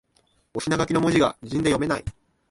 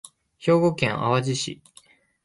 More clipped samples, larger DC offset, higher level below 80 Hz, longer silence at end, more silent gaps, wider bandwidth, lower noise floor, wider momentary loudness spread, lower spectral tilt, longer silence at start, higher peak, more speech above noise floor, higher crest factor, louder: neither; neither; first, -46 dBFS vs -60 dBFS; second, 0.4 s vs 0.7 s; neither; about the same, 11.5 kHz vs 11.5 kHz; first, -65 dBFS vs -56 dBFS; about the same, 12 LU vs 11 LU; about the same, -5.5 dB/octave vs -5.5 dB/octave; first, 0.55 s vs 0.4 s; about the same, -8 dBFS vs -6 dBFS; first, 43 dB vs 34 dB; about the same, 18 dB vs 20 dB; about the same, -23 LUFS vs -23 LUFS